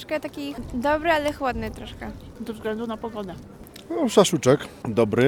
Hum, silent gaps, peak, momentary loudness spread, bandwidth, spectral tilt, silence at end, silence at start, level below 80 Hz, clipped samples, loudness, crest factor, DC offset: none; none; -4 dBFS; 18 LU; 19 kHz; -5 dB/octave; 0 s; 0 s; -46 dBFS; under 0.1%; -24 LUFS; 20 dB; under 0.1%